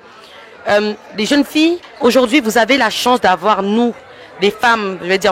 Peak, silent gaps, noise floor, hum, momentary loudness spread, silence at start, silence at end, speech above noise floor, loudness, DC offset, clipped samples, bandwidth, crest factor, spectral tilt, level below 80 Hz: 0 dBFS; none; -38 dBFS; none; 6 LU; 0.35 s; 0 s; 25 dB; -14 LUFS; under 0.1%; under 0.1%; 16.5 kHz; 14 dB; -3.5 dB/octave; -52 dBFS